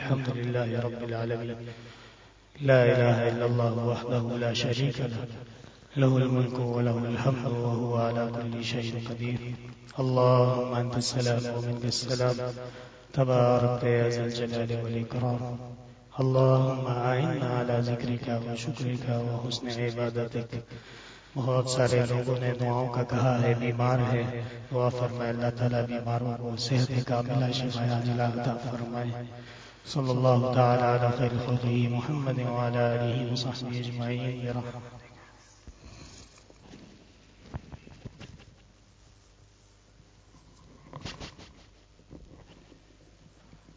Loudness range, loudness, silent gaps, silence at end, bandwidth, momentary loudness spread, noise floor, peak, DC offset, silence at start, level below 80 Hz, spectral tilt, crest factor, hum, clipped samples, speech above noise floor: 21 LU; -28 LUFS; none; 0.2 s; 8 kHz; 19 LU; -58 dBFS; -8 dBFS; under 0.1%; 0 s; -56 dBFS; -6.5 dB/octave; 20 dB; none; under 0.1%; 31 dB